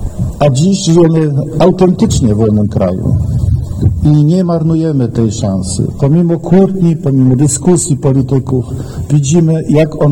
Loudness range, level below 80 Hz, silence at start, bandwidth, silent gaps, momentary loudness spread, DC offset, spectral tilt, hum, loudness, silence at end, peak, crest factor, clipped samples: 1 LU; -26 dBFS; 0 s; 12 kHz; none; 6 LU; 0.7%; -7 dB/octave; none; -11 LUFS; 0 s; 0 dBFS; 10 dB; under 0.1%